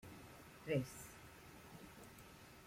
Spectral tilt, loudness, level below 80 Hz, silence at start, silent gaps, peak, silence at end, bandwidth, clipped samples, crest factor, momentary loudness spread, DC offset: -5.5 dB/octave; -49 LUFS; -70 dBFS; 0 s; none; -26 dBFS; 0 s; 16.5 kHz; under 0.1%; 24 dB; 16 LU; under 0.1%